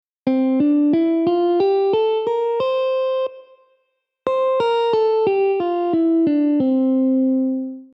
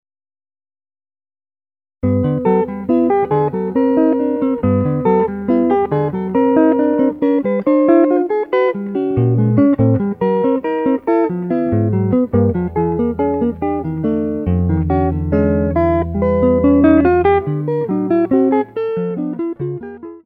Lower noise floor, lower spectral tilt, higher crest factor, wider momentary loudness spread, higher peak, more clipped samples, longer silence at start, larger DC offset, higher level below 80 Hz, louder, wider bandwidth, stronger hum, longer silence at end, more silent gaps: second, -71 dBFS vs under -90 dBFS; second, -8 dB/octave vs -11.5 dB/octave; about the same, 12 dB vs 14 dB; about the same, 5 LU vs 7 LU; second, -6 dBFS vs 0 dBFS; neither; second, 0.25 s vs 2.05 s; neither; second, -66 dBFS vs -36 dBFS; about the same, -18 LUFS vs -16 LUFS; first, 6 kHz vs 4.7 kHz; neither; about the same, 0.1 s vs 0.05 s; neither